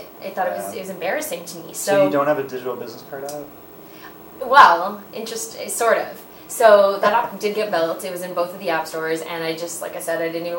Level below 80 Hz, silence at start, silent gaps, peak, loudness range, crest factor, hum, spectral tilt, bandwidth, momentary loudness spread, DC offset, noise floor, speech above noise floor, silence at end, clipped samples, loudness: -64 dBFS; 0 s; none; 0 dBFS; 7 LU; 20 dB; none; -3 dB/octave; 17 kHz; 20 LU; under 0.1%; -40 dBFS; 20 dB; 0 s; under 0.1%; -19 LUFS